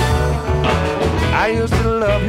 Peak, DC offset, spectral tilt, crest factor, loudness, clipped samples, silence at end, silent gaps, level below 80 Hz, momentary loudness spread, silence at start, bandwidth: -2 dBFS; under 0.1%; -6 dB/octave; 14 dB; -17 LUFS; under 0.1%; 0 s; none; -24 dBFS; 2 LU; 0 s; 15.5 kHz